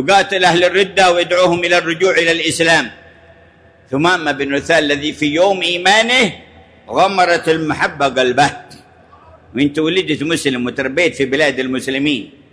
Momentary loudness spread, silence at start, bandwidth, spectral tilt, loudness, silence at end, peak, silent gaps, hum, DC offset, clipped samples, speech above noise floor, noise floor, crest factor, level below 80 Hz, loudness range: 7 LU; 0 s; 11 kHz; -3.5 dB/octave; -14 LUFS; 0.25 s; -2 dBFS; none; none; under 0.1%; under 0.1%; 32 dB; -46 dBFS; 14 dB; -50 dBFS; 4 LU